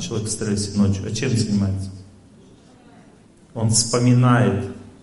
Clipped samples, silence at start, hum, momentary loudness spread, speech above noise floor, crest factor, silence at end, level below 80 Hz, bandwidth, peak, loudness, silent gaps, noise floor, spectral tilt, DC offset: under 0.1%; 0 s; none; 13 LU; 30 dB; 18 dB; 0.1 s; -42 dBFS; 11.5 kHz; -4 dBFS; -20 LUFS; none; -49 dBFS; -5 dB/octave; under 0.1%